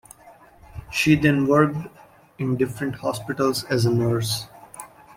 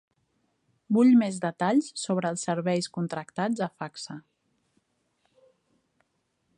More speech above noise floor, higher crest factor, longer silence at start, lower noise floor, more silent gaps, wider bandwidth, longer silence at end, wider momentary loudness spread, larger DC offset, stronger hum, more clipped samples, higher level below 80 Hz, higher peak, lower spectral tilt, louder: second, 29 dB vs 50 dB; about the same, 20 dB vs 18 dB; second, 0.25 s vs 0.9 s; second, -50 dBFS vs -75 dBFS; neither; first, 16.5 kHz vs 10 kHz; second, 0.3 s vs 2.35 s; first, 22 LU vs 17 LU; neither; neither; neither; first, -52 dBFS vs -76 dBFS; first, -4 dBFS vs -12 dBFS; about the same, -5.5 dB/octave vs -5.5 dB/octave; first, -22 LUFS vs -26 LUFS